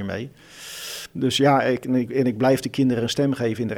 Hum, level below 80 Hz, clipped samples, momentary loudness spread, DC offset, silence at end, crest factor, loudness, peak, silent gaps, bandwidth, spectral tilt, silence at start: none; -58 dBFS; under 0.1%; 15 LU; under 0.1%; 0 s; 18 dB; -22 LUFS; -4 dBFS; none; 17.5 kHz; -5.5 dB/octave; 0 s